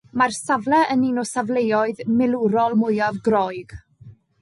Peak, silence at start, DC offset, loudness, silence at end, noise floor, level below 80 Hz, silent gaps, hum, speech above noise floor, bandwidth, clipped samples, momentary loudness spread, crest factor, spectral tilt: -6 dBFS; 0.15 s; under 0.1%; -20 LUFS; 0.3 s; -47 dBFS; -56 dBFS; none; none; 27 dB; 11.5 kHz; under 0.1%; 5 LU; 14 dB; -5.5 dB/octave